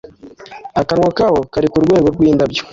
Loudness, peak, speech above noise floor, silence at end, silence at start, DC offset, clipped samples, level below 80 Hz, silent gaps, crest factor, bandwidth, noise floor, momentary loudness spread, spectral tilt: -14 LUFS; -2 dBFS; 24 dB; 0.05 s; 0.25 s; under 0.1%; under 0.1%; -40 dBFS; none; 12 dB; 7.6 kHz; -37 dBFS; 8 LU; -7 dB/octave